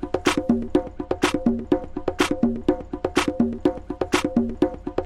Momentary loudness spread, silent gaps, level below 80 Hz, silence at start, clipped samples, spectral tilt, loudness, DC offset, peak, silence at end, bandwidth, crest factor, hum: 4 LU; none; -42 dBFS; 0 s; under 0.1%; -5 dB/octave; -24 LUFS; under 0.1%; -6 dBFS; 0 s; 14.5 kHz; 18 dB; none